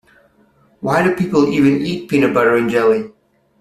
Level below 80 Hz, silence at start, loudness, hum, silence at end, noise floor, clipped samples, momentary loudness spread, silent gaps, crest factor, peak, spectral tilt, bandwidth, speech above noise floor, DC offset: -52 dBFS; 0.8 s; -15 LUFS; none; 0.5 s; -54 dBFS; under 0.1%; 7 LU; none; 14 dB; -2 dBFS; -7 dB/octave; 13.5 kHz; 40 dB; under 0.1%